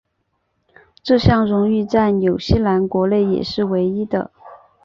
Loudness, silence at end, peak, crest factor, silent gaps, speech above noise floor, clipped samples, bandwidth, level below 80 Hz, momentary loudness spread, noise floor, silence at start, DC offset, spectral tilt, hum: -17 LUFS; 0.3 s; -2 dBFS; 16 dB; none; 53 dB; under 0.1%; 7.2 kHz; -36 dBFS; 8 LU; -70 dBFS; 1.05 s; under 0.1%; -8 dB/octave; none